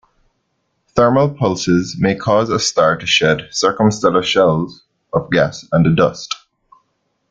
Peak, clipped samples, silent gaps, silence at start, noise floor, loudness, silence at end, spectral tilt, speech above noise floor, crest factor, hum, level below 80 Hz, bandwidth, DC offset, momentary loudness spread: -2 dBFS; under 0.1%; none; 0.95 s; -68 dBFS; -15 LUFS; 0.95 s; -5 dB/octave; 53 dB; 16 dB; none; -48 dBFS; 9.2 kHz; under 0.1%; 9 LU